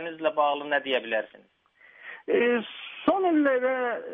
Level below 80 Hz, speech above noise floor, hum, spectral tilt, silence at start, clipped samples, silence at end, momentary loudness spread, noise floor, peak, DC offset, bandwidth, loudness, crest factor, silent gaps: -74 dBFS; 27 dB; none; -7 dB/octave; 0 s; under 0.1%; 0 s; 17 LU; -52 dBFS; -10 dBFS; under 0.1%; 3.9 kHz; -26 LUFS; 16 dB; none